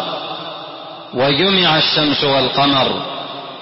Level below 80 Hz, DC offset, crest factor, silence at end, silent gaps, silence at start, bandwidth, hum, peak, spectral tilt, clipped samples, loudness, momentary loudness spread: -52 dBFS; under 0.1%; 14 dB; 0 s; none; 0 s; 6 kHz; none; -2 dBFS; -2 dB/octave; under 0.1%; -14 LUFS; 16 LU